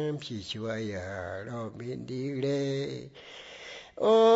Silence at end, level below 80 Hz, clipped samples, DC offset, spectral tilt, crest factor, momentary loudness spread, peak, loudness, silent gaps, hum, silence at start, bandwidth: 0 s; -66 dBFS; under 0.1%; under 0.1%; -6 dB/octave; 18 dB; 14 LU; -12 dBFS; -32 LUFS; none; none; 0 s; 8 kHz